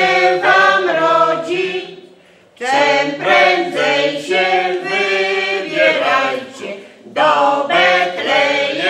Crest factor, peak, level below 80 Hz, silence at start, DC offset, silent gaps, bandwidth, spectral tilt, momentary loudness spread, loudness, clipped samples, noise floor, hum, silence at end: 14 dB; 0 dBFS; -66 dBFS; 0 s; under 0.1%; none; 12 kHz; -3 dB/octave; 13 LU; -14 LUFS; under 0.1%; -46 dBFS; none; 0 s